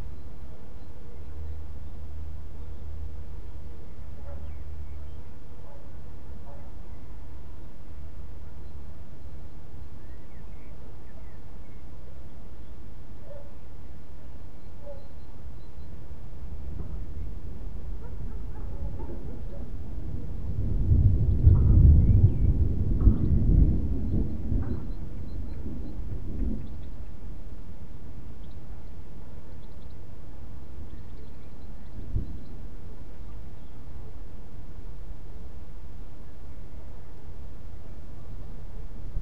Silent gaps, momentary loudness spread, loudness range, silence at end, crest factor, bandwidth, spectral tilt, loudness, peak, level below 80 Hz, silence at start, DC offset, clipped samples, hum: none; 23 LU; 23 LU; 0 s; 24 dB; 5 kHz; -10 dB/octave; -29 LUFS; -6 dBFS; -32 dBFS; 0 s; 5%; under 0.1%; none